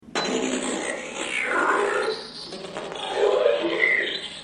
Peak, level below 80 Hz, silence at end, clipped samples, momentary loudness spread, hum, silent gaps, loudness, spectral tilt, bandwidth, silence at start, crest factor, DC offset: -6 dBFS; -62 dBFS; 0 s; under 0.1%; 13 LU; none; none; -24 LUFS; -2 dB/octave; 11.5 kHz; 0.05 s; 18 dB; under 0.1%